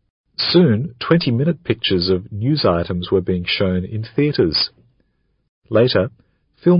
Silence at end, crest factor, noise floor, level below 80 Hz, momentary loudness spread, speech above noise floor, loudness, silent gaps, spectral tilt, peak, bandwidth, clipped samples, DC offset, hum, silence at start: 0 s; 18 dB; -64 dBFS; -46 dBFS; 7 LU; 47 dB; -18 LUFS; 5.49-5.62 s; -12 dB/octave; -2 dBFS; 5.6 kHz; under 0.1%; under 0.1%; none; 0.4 s